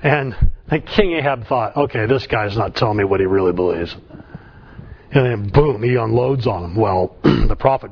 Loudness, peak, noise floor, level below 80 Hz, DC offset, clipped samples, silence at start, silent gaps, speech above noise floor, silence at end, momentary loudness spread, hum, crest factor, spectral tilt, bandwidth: -18 LUFS; 0 dBFS; -39 dBFS; -28 dBFS; under 0.1%; under 0.1%; 0 s; none; 22 dB; 0 s; 6 LU; none; 18 dB; -8.5 dB/octave; 5.4 kHz